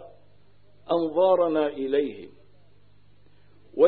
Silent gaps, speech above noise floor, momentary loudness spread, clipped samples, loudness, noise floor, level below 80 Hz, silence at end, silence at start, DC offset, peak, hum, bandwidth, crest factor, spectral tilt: none; 36 dB; 15 LU; under 0.1%; -24 LUFS; -60 dBFS; -68 dBFS; 0 s; 0 s; 0.3%; -8 dBFS; 50 Hz at -60 dBFS; 4.5 kHz; 20 dB; -10 dB/octave